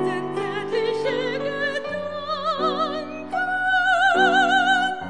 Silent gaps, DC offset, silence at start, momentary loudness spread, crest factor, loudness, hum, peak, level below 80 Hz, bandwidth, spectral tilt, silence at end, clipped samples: none; 0.5%; 0 s; 11 LU; 16 dB; -22 LUFS; none; -6 dBFS; -66 dBFS; 10 kHz; -4 dB/octave; 0 s; under 0.1%